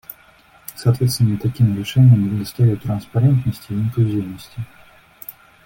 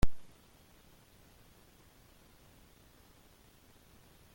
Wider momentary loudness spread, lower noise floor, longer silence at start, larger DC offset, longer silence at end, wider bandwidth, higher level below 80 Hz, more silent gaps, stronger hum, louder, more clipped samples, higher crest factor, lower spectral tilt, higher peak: first, 22 LU vs 1 LU; second, -50 dBFS vs -62 dBFS; first, 0.7 s vs 0.05 s; neither; second, 0.35 s vs 4.15 s; about the same, 17 kHz vs 17 kHz; about the same, -48 dBFS vs -46 dBFS; neither; neither; first, -18 LUFS vs -55 LUFS; neither; second, 16 dB vs 24 dB; first, -7.5 dB/octave vs -6 dB/octave; first, -4 dBFS vs -12 dBFS